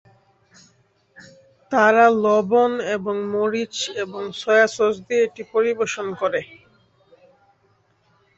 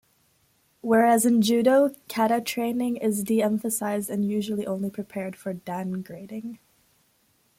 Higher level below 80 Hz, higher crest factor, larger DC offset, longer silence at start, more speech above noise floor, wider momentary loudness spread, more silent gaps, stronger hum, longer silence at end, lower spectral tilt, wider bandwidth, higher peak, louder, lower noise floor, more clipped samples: about the same, -66 dBFS vs -68 dBFS; about the same, 20 dB vs 18 dB; neither; first, 1.7 s vs 0.85 s; about the same, 43 dB vs 42 dB; second, 11 LU vs 16 LU; neither; neither; first, 1.9 s vs 1.05 s; about the same, -4 dB/octave vs -5 dB/octave; second, 8 kHz vs 16.5 kHz; first, -2 dBFS vs -8 dBFS; first, -20 LUFS vs -24 LUFS; second, -62 dBFS vs -66 dBFS; neither